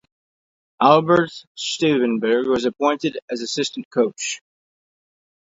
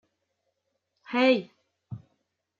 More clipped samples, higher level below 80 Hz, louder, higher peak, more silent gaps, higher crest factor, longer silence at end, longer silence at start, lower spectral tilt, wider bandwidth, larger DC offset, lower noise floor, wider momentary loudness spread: neither; first, -62 dBFS vs -74 dBFS; first, -20 LUFS vs -25 LUFS; first, 0 dBFS vs -10 dBFS; first, 1.47-1.55 s, 3.22-3.28 s, 3.85-3.91 s vs none; about the same, 20 dB vs 20 dB; first, 1.05 s vs 0.6 s; second, 0.8 s vs 1.1 s; second, -4.5 dB/octave vs -6.5 dB/octave; about the same, 8 kHz vs 7.4 kHz; neither; first, under -90 dBFS vs -79 dBFS; second, 12 LU vs 22 LU